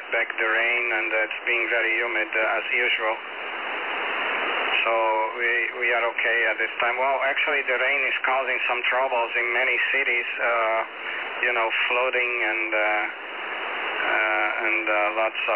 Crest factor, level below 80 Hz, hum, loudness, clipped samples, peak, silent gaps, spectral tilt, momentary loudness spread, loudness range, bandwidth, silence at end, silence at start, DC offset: 16 dB; -76 dBFS; none; -22 LUFS; under 0.1%; -8 dBFS; none; -4 dB/octave; 6 LU; 2 LU; 4 kHz; 0 s; 0 s; 0.1%